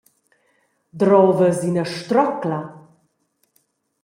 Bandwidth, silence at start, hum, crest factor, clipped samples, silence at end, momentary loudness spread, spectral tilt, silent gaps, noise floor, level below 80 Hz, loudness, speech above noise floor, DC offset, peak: 15.5 kHz; 0.95 s; none; 18 dB; under 0.1%; 1.25 s; 12 LU; -7 dB/octave; none; -68 dBFS; -66 dBFS; -18 LUFS; 50 dB; under 0.1%; -2 dBFS